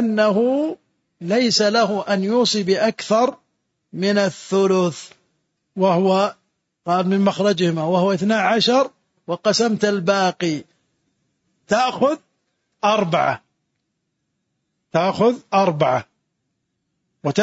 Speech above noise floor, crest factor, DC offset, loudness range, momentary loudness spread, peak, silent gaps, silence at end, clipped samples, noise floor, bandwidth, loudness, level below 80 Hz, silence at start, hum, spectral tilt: 57 dB; 16 dB; under 0.1%; 4 LU; 8 LU; -4 dBFS; none; 0 s; under 0.1%; -75 dBFS; 8 kHz; -19 LUFS; -66 dBFS; 0 s; none; -5 dB/octave